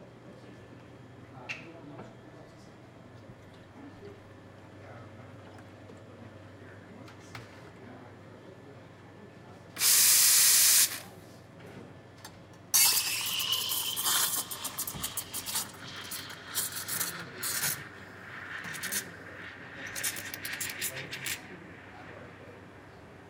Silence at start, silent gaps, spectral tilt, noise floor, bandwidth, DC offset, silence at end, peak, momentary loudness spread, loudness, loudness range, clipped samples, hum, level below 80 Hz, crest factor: 0 s; none; 0.5 dB/octave; -52 dBFS; 18 kHz; under 0.1%; 0 s; -10 dBFS; 29 LU; -26 LUFS; 26 LU; under 0.1%; none; -70 dBFS; 24 dB